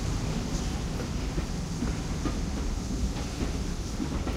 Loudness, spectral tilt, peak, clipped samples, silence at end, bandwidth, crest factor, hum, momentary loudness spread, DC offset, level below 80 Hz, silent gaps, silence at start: -32 LUFS; -5.5 dB/octave; -16 dBFS; under 0.1%; 0 s; 15.5 kHz; 14 dB; none; 2 LU; under 0.1%; -34 dBFS; none; 0 s